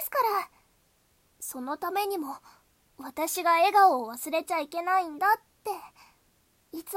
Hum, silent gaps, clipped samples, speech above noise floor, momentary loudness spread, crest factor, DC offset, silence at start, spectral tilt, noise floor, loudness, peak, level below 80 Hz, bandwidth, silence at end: none; none; under 0.1%; 40 dB; 19 LU; 18 dB; under 0.1%; 0 s; -1 dB/octave; -67 dBFS; -27 LUFS; -12 dBFS; -74 dBFS; 16.5 kHz; 0 s